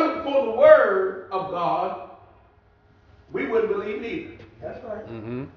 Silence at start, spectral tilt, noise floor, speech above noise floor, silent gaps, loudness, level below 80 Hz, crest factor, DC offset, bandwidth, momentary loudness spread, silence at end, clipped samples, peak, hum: 0 s; -7.5 dB/octave; -57 dBFS; 29 dB; none; -21 LUFS; -58 dBFS; 22 dB; under 0.1%; 6 kHz; 22 LU; 0.05 s; under 0.1%; -2 dBFS; none